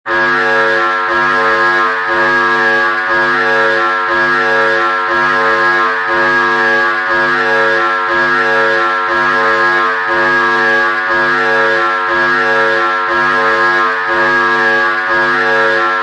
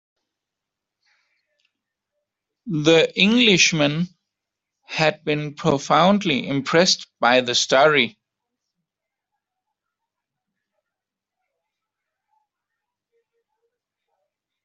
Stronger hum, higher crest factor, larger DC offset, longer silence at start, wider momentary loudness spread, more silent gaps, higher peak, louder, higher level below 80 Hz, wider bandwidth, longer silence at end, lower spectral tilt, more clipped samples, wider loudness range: neither; second, 12 dB vs 22 dB; neither; second, 0.05 s vs 2.65 s; second, 2 LU vs 10 LU; neither; about the same, 0 dBFS vs -2 dBFS; first, -11 LUFS vs -18 LUFS; first, -50 dBFS vs -62 dBFS; first, 10 kHz vs 8 kHz; second, 0 s vs 6.55 s; about the same, -4 dB/octave vs -3.5 dB/octave; neither; second, 0 LU vs 5 LU